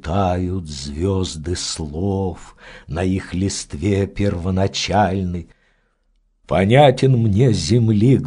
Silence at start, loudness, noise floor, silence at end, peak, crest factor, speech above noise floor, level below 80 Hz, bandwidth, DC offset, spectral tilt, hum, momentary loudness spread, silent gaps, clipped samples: 0.05 s; -19 LUFS; -62 dBFS; 0 s; 0 dBFS; 18 dB; 45 dB; -38 dBFS; 10.5 kHz; under 0.1%; -6 dB/octave; none; 12 LU; none; under 0.1%